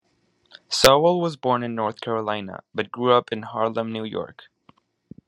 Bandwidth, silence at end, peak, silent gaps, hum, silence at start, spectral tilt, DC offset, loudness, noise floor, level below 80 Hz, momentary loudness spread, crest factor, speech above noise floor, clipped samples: 12 kHz; 1 s; 0 dBFS; none; none; 0.7 s; -4 dB/octave; under 0.1%; -22 LUFS; -67 dBFS; -56 dBFS; 15 LU; 24 dB; 44 dB; under 0.1%